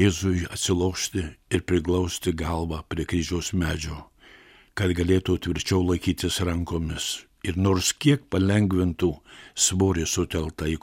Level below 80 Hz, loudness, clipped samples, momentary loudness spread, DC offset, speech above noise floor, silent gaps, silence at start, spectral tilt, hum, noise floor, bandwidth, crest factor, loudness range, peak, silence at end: -40 dBFS; -25 LUFS; under 0.1%; 9 LU; under 0.1%; 28 dB; none; 0 s; -4.5 dB/octave; none; -52 dBFS; 16.5 kHz; 18 dB; 4 LU; -6 dBFS; 0.05 s